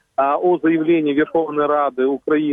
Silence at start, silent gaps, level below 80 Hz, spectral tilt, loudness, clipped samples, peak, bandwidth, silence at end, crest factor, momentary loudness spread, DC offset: 0.2 s; none; -62 dBFS; -9 dB/octave; -18 LUFS; under 0.1%; -6 dBFS; 3.8 kHz; 0 s; 12 dB; 3 LU; under 0.1%